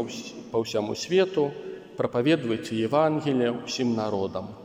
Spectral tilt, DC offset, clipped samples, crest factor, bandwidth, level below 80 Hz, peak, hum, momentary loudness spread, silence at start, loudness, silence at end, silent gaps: -5.5 dB/octave; under 0.1%; under 0.1%; 18 dB; 15.5 kHz; -66 dBFS; -10 dBFS; none; 9 LU; 0 s; -26 LUFS; 0 s; none